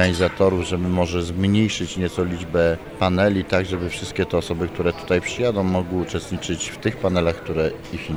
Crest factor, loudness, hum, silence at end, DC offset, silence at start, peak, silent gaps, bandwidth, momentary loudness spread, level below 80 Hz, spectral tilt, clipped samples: 16 dB; -22 LUFS; none; 0 s; under 0.1%; 0 s; -4 dBFS; none; over 20 kHz; 7 LU; -42 dBFS; -5.5 dB/octave; under 0.1%